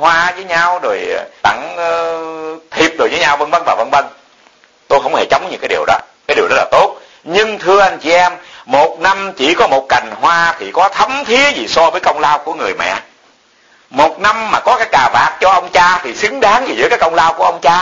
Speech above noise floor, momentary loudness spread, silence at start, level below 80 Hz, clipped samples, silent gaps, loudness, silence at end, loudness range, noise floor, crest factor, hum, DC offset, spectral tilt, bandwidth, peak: 37 dB; 7 LU; 0 s; -46 dBFS; under 0.1%; none; -12 LUFS; 0 s; 4 LU; -49 dBFS; 12 dB; none; under 0.1%; -2.5 dB/octave; 8.4 kHz; 0 dBFS